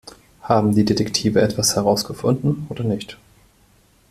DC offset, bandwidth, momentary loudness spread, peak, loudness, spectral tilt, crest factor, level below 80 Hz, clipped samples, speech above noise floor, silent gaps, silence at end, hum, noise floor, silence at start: under 0.1%; 14.5 kHz; 8 LU; -2 dBFS; -19 LUFS; -5 dB/octave; 18 dB; -50 dBFS; under 0.1%; 37 dB; none; 0.95 s; none; -56 dBFS; 0.05 s